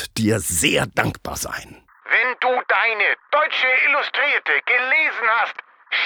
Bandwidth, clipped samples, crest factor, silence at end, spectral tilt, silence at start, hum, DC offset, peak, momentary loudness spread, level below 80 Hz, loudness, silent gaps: over 20 kHz; under 0.1%; 20 dB; 0 s; -2.5 dB/octave; 0 s; none; under 0.1%; -2 dBFS; 11 LU; -48 dBFS; -18 LUFS; none